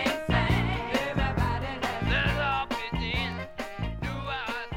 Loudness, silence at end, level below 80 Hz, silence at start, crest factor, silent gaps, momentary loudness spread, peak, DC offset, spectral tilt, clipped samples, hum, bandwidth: -29 LUFS; 0 s; -36 dBFS; 0 s; 18 dB; none; 8 LU; -12 dBFS; under 0.1%; -5.5 dB/octave; under 0.1%; none; 16.5 kHz